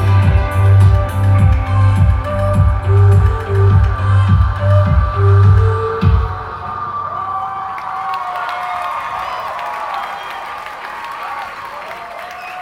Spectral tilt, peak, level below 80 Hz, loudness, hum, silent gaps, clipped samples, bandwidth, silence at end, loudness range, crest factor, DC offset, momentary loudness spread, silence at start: -8 dB/octave; 0 dBFS; -22 dBFS; -15 LUFS; none; none; under 0.1%; 5.6 kHz; 0 s; 10 LU; 12 dB; under 0.1%; 15 LU; 0 s